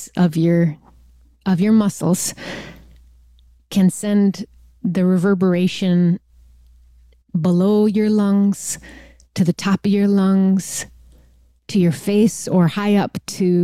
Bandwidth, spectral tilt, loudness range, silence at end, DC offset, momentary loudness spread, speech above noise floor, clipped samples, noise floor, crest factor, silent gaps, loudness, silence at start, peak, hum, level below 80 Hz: 14.5 kHz; -6.5 dB/octave; 3 LU; 0 s; under 0.1%; 12 LU; 36 dB; under 0.1%; -52 dBFS; 12 dB; none; -18 LUFS; 0 s; -6 dBFS; none; -52 dBFS